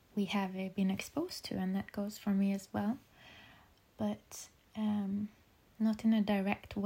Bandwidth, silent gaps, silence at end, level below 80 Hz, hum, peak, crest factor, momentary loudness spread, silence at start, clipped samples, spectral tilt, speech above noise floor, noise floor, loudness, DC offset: 16 kHz; none; 0 s; -66 dBFS; none; -16 dBFS; 20 dB; 17 LU; 0.15 s; under 0.1%; -6 dB/octave; 28 dB; -63 dBFS; -36 LUFS; under 0.1%